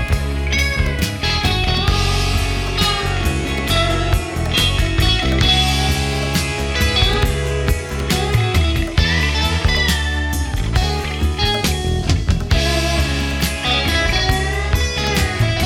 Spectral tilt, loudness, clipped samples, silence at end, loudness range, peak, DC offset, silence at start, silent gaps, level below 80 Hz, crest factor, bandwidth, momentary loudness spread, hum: -4 dB/octave; -17 LUFS; under 0.1%; 0 s; 2 LU; 0 dBFS; under 0.1%; 0 s; none; -22 dBFS; 16 dB; 17 kHz; 5 LU; none